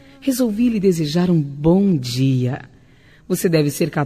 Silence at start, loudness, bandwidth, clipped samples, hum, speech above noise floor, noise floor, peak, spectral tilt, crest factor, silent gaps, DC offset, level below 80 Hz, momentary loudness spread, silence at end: 0.2 s; -18 LUFS; 14 kHz; under 0.1%; none; 32 dB; -49 dBFS; -4 dBFS; -6.5 dB/octave; 14 dB; none; 0.1%; -46 dBFS; 7 LU; 0 s